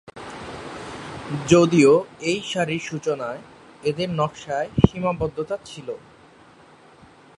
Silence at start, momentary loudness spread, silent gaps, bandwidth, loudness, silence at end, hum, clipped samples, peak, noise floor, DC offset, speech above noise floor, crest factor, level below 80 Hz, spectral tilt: 0.15 s; 19 LU; none; 11.5 kHz; -22 LUFS; 1.4 s; none; under 0.1%; 0 dBFS; -50 dBFS; under 0.1%; 29 dB; 22 dB; -44 dBFS; -6 dB/octave